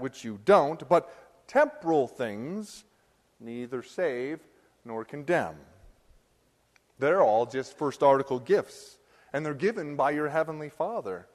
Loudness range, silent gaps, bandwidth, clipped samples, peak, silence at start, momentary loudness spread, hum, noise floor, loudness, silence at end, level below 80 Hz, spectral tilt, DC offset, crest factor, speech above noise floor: 7 LU; none; 13 kHz; under 0.1%; -8 dBFS; 0 s; 16 LU; none; -68 dBFS; -28 LUFS; 0.15 s; -68 dBFS; -6 dB/octave; under 0.1%; 20 dB; 41 dB